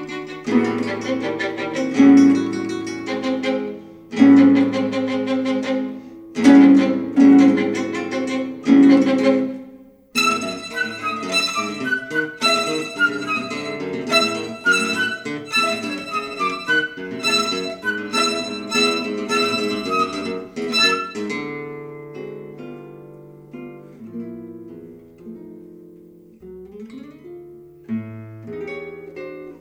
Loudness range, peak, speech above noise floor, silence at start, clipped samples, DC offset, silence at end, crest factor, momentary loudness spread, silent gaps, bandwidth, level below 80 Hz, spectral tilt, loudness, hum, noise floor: 21 LU; -2 dBFS; 24 dB; 0 s; under 0.1%; under 0.1%; 0.05 s; 18 dB; 24 LU; none; 12.5 kHz; -62 dBFS; -4 dB/octave; -18 LUFS; none; -45 dBFS